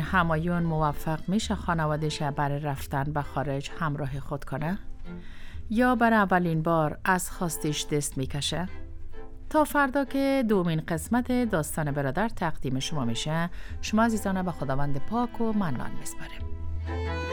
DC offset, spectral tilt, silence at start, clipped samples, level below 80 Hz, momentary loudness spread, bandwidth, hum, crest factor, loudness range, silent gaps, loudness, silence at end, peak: under 0.1%; -5.5 dB/octave; 0 s; under 0.1%; -40 dBFS; 13 LU; 19.5 kHz; none; 18 dB; 4 LU; none; -28 LUFS; 0 s; -10 dBFS